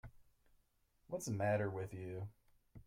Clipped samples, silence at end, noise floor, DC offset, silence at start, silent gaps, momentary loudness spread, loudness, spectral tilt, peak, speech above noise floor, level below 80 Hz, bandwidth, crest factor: under 0.1%; 0.05 s; -77 dBFS; under 0.1%; 0.05 s; none; 14 LU; -42 LUFS; -6.5 dB/octave; -26 dBFS; 36 dB; -68 dBFS; 16 kHz; 18 dB